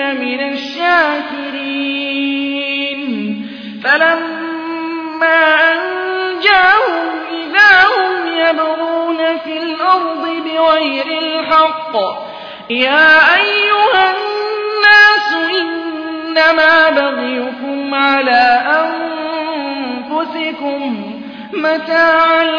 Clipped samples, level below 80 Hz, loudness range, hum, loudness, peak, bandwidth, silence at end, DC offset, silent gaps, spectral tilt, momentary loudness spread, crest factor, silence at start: under 0.1%; -56 dBFS; 6 LU; none; -12 LUFS; 0 dBFS; 5.4 kHz; 0 s; under 0.1%; none; -4 dB/octave; 13 LU; 14 dB; 0 s